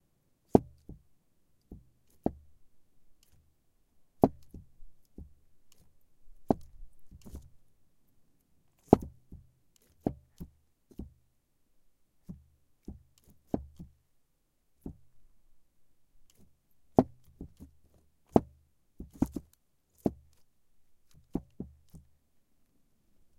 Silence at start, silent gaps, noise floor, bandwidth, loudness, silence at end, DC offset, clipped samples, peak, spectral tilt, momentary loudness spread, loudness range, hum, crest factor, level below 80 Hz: 0.55 s; none; -73 dBFS; 16.5 kHz; -32 LUFS; 1.4 s; under 0.1%; under 0.1%; -2 dBFS; -9.5 dB/octave; 27 LU; 13 LU; none; 34 dB; -56 dBFS